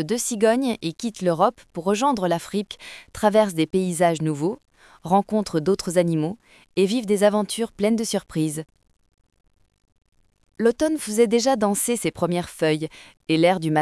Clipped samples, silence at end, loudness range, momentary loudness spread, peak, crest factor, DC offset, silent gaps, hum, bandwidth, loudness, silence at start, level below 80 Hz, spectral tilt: under 0.1%; 0 s; 4 LU; 10 LU; -4 dBFS; 18 dB; under 0.1%; none; none; 12 kHz; -22 LUFS; 0 s; -58 dBFS; -5 dB/octave